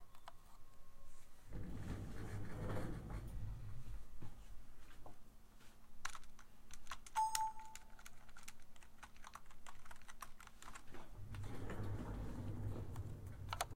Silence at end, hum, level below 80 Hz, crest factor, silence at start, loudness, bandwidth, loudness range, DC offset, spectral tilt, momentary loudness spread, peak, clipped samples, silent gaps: 0 s; none; -56 dBFS; 26 dB; 0 s; -50 LUFS; 16 kHz; 10 LU; under 0.1%; -4.5 dB/octave; 19 LU; -20 dBFS; under 0.1%; none